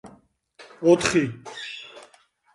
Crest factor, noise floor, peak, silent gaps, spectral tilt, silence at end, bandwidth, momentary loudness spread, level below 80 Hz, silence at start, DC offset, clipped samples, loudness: 22 dB; -58 dBFS; -4 dBFS; none; -4.5 dB/octave; 0.55 s; 11.5 kHz; 19 LU; -58 dBFS; 0.05 s; under 0.1%; under 0.1%; -22 LUFS